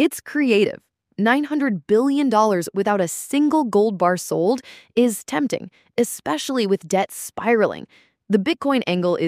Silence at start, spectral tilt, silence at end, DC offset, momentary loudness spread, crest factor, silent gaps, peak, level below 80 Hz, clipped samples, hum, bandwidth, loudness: 0 s; -5 dB/octave; 0 s; under 0.1%; 8 LU; 16 dB; none; -4 dBFS; -66 dBFS; under 0.1%; none; 15.5 kHz; -20 LUFS